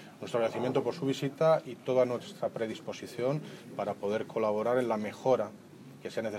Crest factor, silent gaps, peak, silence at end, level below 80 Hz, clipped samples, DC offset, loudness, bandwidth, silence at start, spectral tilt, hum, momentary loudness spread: 18 dB; none; -14 dBFS; 0 s; -82 dBFS; under 0.1%; under 0.1%; -32 LUFS; 15.5 kHz; 0 s; -6.5 dB/octave; none; 11 LU